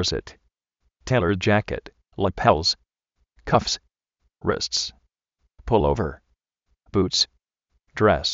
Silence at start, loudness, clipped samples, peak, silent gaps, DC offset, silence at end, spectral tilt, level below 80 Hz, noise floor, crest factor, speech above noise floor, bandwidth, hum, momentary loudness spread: 0 s; -23 LUFS; under 0.1%; -2 dBFS; none; under 0.1%; 0 s; -3.5 dB/octave; -42 dBFS; -73 dBFS; 22 dB; 51 dB; 8 kHz; none; 13 LU